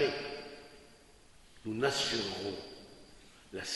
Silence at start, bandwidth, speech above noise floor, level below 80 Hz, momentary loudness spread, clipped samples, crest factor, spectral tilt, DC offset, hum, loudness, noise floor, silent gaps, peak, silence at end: 0 s; 11.5 kHz; 25 dB; -64 dBFS; 25 LU; under 0.1%; 22 dB; -3 dB/octave; under 0.1%; none; -36 LUFS; -59 dBFS; none; -16 dBFS; 0 s